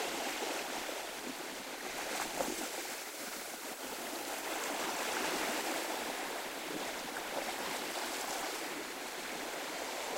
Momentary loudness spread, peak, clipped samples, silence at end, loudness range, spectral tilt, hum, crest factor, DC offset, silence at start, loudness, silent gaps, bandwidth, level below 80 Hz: 6 LU; -20 dBFS; under 0.1%; 0 s; 2 LU; -1 dB/octave; none; 20 dB; under 0.1%; 0 s; -38 LUFS; none; 16 kHz; -70 dBFS